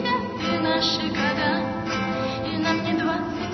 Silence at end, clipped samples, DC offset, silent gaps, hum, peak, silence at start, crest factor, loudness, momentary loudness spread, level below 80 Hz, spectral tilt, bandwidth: 0 s; under 0.1%; under 0.1%; none; none; -8 dBFS; 0 s; 16 dB; -24 LUFS; 5 LU; -50 dBFS; -5 dB/octave; 6.4 kHz